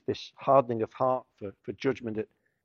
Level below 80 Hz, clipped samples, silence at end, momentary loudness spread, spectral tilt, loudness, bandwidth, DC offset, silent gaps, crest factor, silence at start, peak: -68 dBFS; under 0.1%; 0.4 s; 17 LU; -7 dB/octave; -29 LUFS; 6.8 kHz; under 0.1%; none; 22 dB; 0.1 s; -8 dBFS